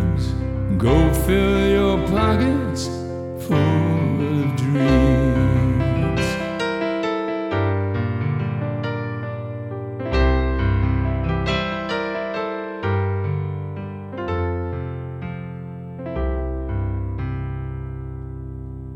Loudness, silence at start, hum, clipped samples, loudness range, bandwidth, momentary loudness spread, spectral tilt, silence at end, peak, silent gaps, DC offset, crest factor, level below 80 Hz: -22 LUFS; 0 s; none; under 0.1%; 9 LU; 16 kHz; 13 LU; -7 dB/octave; 0 s; -4 dBFS; none; under 0.1%; 18 dB; -30 dBFS